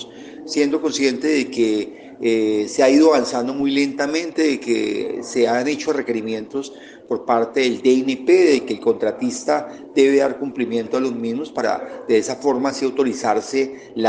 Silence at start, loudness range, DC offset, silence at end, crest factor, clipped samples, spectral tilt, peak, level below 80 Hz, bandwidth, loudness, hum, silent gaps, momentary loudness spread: 0 s; 3 LU; under 0.1%; 0 s; 18 dB; under 0.1%; -4 dB/octave; -2 dBFS; -66 dBFS; 9.8 kHz; -19 LUFS; none; none; 10 LU